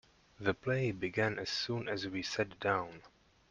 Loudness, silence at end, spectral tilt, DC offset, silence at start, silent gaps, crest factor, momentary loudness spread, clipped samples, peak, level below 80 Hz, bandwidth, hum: -36 LUFS; 0.45 s; -5 dB/octave; under 0.1%; 0.4 s; none; 20 dB; 4 LU; under 0.1%; -16 dBFS; -66 dBFS; 9.4 kHz; none